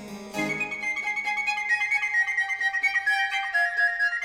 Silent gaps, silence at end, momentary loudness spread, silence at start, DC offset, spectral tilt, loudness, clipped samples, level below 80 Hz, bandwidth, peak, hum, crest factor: none; 0 s; 5 LU; 0 s; under 0.1%; -2 dB/octave; -24 LUFS; under 0.1%; -66 dBFS; 17 kHz; -14 dBFS; none; 12 dB